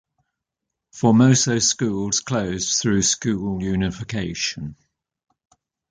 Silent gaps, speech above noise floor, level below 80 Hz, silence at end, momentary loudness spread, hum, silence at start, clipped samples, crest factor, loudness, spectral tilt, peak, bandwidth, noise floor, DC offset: none; 63 dB; -46 dBFS; 1.15 s; 10 LU; none; 0.95 s; under 0.1%; 18 dB; -20 LUFS; -4 dB/octave; -4 dBFS; 10 kHz; -83 dBFS; under 0.1%